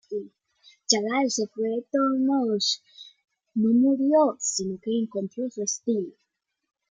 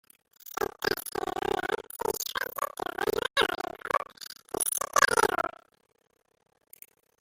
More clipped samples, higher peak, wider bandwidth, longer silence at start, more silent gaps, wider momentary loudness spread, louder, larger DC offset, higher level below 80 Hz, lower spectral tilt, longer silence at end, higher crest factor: neither; about the same, -4 dBFS vs -6 dBFS; second, 9.6 kHz vs 16.5 kHz; second, 0.1 s vs 0.45 s; neither; about the same, 11 LU vs 12 LU; first, -25 LUFS vs -29 LUFS; neither; second, -72 dBFS vs -60 dBFS; first, -3.5 dB/octave vs -1.5 dB/octave; second, 0.8 s vs 1.75 s; about the same, 22 dB vs 24 dB